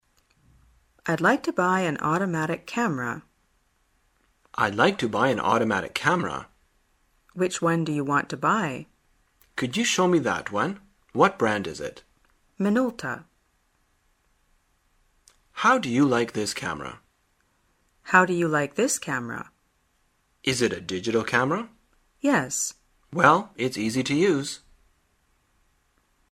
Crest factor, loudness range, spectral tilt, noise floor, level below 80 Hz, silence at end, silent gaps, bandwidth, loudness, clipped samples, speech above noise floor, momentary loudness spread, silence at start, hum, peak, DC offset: 26 dB; 4 LU; -4.5 dB/octave; -68 dBFS; -62 dBFS; 1.75 s; none; 16 kHz; -24 LUFS; under 0.1%; 44 dB; 14 LU; 1.05 s; none; 0 dBFS; under 0.1%